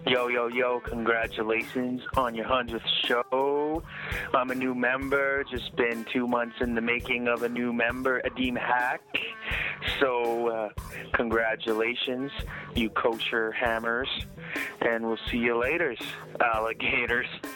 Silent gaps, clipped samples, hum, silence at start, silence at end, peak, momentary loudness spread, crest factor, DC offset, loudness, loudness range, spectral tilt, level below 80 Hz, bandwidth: none; under 0.1%; none; 0 s; 0 s; -8 dBFS; 6 LU; 20 dB; under 0.1%; -28 LUFS; 1 LU; -5 dB/octave; -48 dBFS; 18 kHz